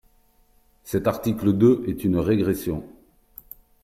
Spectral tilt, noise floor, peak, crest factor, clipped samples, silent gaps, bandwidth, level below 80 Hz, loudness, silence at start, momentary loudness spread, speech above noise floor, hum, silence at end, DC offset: -7.5 dB/octave; -60 dBFS; -6 dBFS; 18 dB; under 0.1%; none; 16 kHz; -50 dBFS; -22 LUFS; 0.85 s; 14 LU; 38 dB; none; 0.9 s; under 0.1%